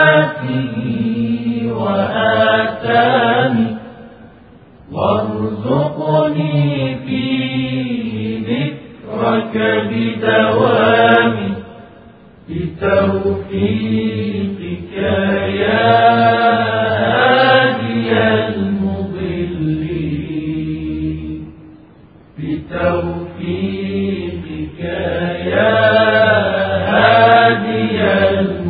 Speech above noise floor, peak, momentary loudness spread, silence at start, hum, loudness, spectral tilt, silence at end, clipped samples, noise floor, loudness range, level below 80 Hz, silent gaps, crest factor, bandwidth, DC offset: 28 dB; 0 dBFS; 12 LU; 0 s; none; -15 LUFS; -10 dB/octave; 0 s; under 0.1%; -43 dBFS; 9 LU; -46 dBFS; none; 16 dB; 4.9 kHz; under 0.1%